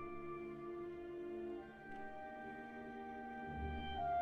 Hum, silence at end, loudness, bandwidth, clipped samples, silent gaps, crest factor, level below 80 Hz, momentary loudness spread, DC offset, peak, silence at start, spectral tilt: none; 0 s; -48 LUFS; 8.2 kHz; under 0.1%; none; 14 dB; -60 dBFS; 6 LU; under 0.1%; -32 dBFS; 0 s; -7.5 dB/octave